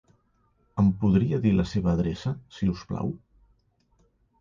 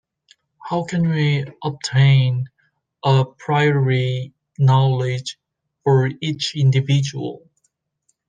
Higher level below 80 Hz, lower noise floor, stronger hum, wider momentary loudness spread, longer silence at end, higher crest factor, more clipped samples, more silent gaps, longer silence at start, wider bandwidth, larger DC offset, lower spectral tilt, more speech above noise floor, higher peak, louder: first, -44 dBFS vs -62 dBFS; about the same, -67 dBFS vs -69 dBFS; neither; about the same, 11 LU vs 13 LU; first, 1.25 s vs 0.9 s; about the same, 16 dB vs 16 dB; neither; neither; about the same, 0.75 s vs 0.65 s; second, 7.2 kHz vs 9 kHz; neither; first, -8.5 dB/octave vs -6.5 dB/octave; second, 43 dB vs 52 dB; second, -12 dBFS vs -4 dBFS; second, -26 LUFS vs -19 LUFS